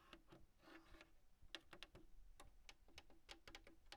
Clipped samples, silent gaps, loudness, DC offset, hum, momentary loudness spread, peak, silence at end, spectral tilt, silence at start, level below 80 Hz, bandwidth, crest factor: under 0.1%; none; -64 LUFS; under 0.1%; none; 9 LU; -32 dBFS; 0 s; -2.5 dB/octave; 0 s; -70 dBFS; 15 kHz; 30 dB